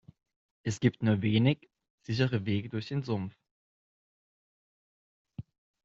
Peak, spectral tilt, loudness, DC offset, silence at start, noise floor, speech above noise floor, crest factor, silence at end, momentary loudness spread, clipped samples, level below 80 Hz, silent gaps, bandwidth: -10 dBFS; -6.5 dB/octave; -31 LUFS; under 0.1%; 0.65 s; under -90 dBFS; over 61 dB; 22 dB; 0.45 s; 21 LU; under 0.1%; -66 dBFS; 1.90-1.98 s, 3.51-5.25 s; 8 kHz